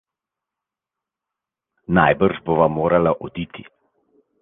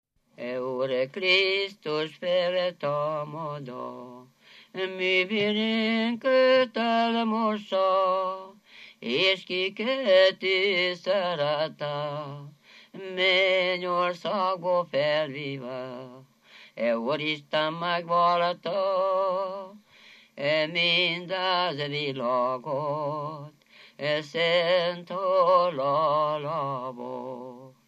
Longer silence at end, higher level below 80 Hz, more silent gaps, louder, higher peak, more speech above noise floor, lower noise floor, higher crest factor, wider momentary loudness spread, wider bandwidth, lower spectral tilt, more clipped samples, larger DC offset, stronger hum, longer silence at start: first, 0.8 s vs 0.2 s; first, -48 dBFS vs -86 dBFS; neither; first, -18 LUFS vs -26 LUFS; first, -2 dBFS vs -8 dBFS; first, 68 dB vs 28 dB; first, -86 dBFS vs -54 dBFS; about the same, 20 dB vs 18 dB; about the same, 15 LU vs 15 LU; second, 3.9 kHz vs 8.6 kHz; first, -10 dB/octave vs -5.5 dB/octave; neither; neither; neither; first, 1.9 s vs 0.4 s